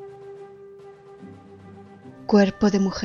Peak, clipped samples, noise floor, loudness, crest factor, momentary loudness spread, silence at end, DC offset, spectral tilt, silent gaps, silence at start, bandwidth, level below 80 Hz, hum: -6 dBFS; under 0.1%; -45 dBFS; -20 LUFS; 20 dB; 26 LU; 0 s; under 0.1%; -6.5 dB/octave; none; 0 s; 7.2 kHz; -52 dBFS; none